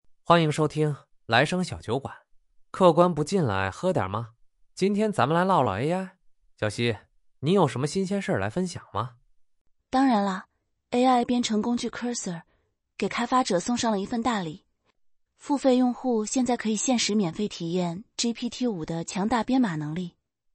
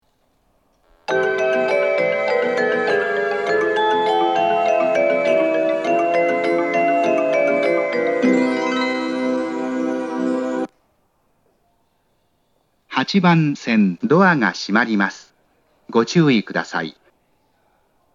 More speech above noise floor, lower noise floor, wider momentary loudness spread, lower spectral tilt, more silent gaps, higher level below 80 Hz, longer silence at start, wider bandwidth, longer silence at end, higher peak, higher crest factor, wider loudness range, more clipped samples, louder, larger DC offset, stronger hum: about the same, 46 dB vs 48 dB; first, -71 dBFS vs -65 dBFS; first, 11 LU vs 7 LU; about the same, -5 dB/octave vs -6 dB/octave; first, 9.61-9.65 s vs none; first, -60 dBFS vs -70 dBFS; second, 0.3 s vs 1.1 s; about the same, 11.5 kHz vs 10.5 kHz; second, 0.45 s vs 1.25 s; second, -4 dBFS vs 0 dBFS; about the same, 22 dB vs 18 dB; second, 3 LU vs 6 LU; neither; second, -26 LUFS vs -18 LUFS; neither; neither